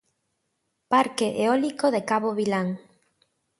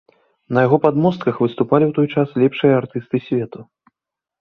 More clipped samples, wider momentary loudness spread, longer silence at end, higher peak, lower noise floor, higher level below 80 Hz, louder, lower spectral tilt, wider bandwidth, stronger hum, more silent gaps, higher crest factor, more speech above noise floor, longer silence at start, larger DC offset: neither; second, 5 LU vs 8 LU; about the same, 0.8 s vs 0.8 s; second, -8 dBFS vs 0 dBFS; second, -76 dBFS vs -85 dBFS; second, -72 dBFS vs -58 dBFS; second, -24 LUFS vs -17 LUFS; second, -5 dB/octave vs -9.5 dB/octave; first, 11.5 kHz vs 6.2 kHz; neither; neither; about the same, 18 dB vs 18 dB; second, 53 dB vs 69 dB; first, 0.9 s vs 0.5 s; neither